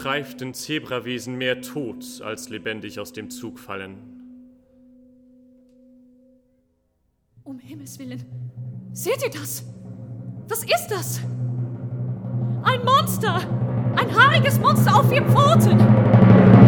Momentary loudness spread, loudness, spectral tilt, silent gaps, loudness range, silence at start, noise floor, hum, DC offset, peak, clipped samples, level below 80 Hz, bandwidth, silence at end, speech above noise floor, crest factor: 21 LU; -19 LUFS; -6 dB/octave; none; 23 LU; 0 s; -68 dBFS; none; under 0.1%; 0 dBFS; under 0.1%; -52 dBFS; 19 kHz; 0 s; 48 dB; 20 dB